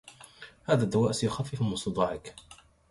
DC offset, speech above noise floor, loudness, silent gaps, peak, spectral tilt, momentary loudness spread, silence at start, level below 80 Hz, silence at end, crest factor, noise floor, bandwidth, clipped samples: under 0.1%; 23 dB; -29 LUFS; none; -10 dBFS; -6 dB/octave; 22 LU; 0.05 s; -56 dBFS; 0.35 s; 22 dB; -51 dBFS; 11.5 kHz; under 0.1%